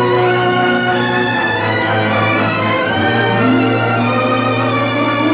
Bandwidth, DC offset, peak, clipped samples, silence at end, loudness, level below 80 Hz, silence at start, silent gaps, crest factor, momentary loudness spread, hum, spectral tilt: 4 kHz; under 0.1%; -2 dBFS; under 0.1%; 0 s; -14 LUFS; -46 dBFS; 0 s; none; 12 dB; 2 LU; none; -10 dB/octave